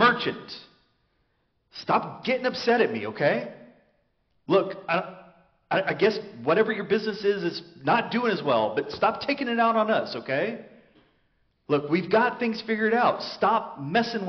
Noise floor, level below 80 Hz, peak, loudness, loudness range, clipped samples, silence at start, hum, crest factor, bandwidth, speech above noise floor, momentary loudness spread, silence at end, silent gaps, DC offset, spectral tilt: -71 dBFS; -68 dBFS; -8 dBFS; -25 LUFS; 2 LU; under 0.1%; 0 s; none; 18 dB; 6.4 kHz; 46 dB; 9 LU; 0 s; none; under 0.1%; -3 dB/octave